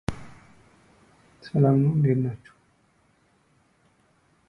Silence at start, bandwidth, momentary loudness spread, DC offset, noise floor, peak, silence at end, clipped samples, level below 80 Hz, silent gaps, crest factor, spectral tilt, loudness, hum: 0.1 s; 10 kHz; 25 LU; under 0.1%; -64 dBFS; -8 dBFS; 2.15 s; under 0.1%; -52 dBFS; none; 20 dB; -9.5 dB/octave; -23 LUFS; none